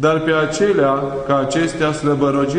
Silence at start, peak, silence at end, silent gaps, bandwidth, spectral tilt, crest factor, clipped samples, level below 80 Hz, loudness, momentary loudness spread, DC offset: 0 s; -4 dBFS; 0 s; none; 10.5 kHz; -5.5 dB/octave; 14 dB; under 0.1%; -44 dBFS; -17 LUFS; 3 LU; under 0.1%